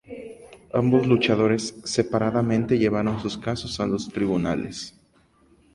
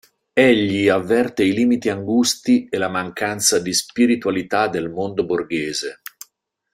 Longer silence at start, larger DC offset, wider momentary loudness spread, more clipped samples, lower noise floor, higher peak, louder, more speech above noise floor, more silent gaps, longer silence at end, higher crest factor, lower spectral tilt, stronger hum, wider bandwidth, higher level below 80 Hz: second, 0.1 s vs 0.35 s; neither; first, 15 LU vs 8 LU; neither; about the same, -60 dBFS vs -63 dBFS; second, -6 dBFS vs -2 dBFS; second, -23 LUFS vs -19 LUFS; second, 37 dB vs 44 dB; neither; about the same, 0.85 s vs 0.8 s; about the same, 18 dB vs 16 dB; first, -6 dB/octave vs -3.5 dB/octave; neither; second, 11.5 kHz vs 16 kHz; first, -50 dBFS vs -58 dBFS